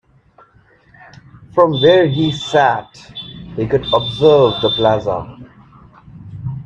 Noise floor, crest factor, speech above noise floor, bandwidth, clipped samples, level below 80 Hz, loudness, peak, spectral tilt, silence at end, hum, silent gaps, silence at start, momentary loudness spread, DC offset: -51 dBFS; 16 dB; 37 dB; 8.2 kHz; under 0.1%; -46 dBFS; -14 LUFS; 0 dBFS; -6.5 dB/octave; 0 s; none; none; 1.55 s; 20 LU; under 0.1%